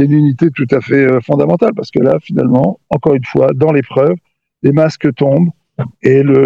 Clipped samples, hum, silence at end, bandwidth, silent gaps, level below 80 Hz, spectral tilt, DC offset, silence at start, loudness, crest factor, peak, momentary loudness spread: 0.1%; none; 0 s; 7.4 kHz; none; -50 dBFS; -9.5 dB/octave; 0.1%; 0 s; -12 LUFS; 12 dB; 0 dBFS; 5 LU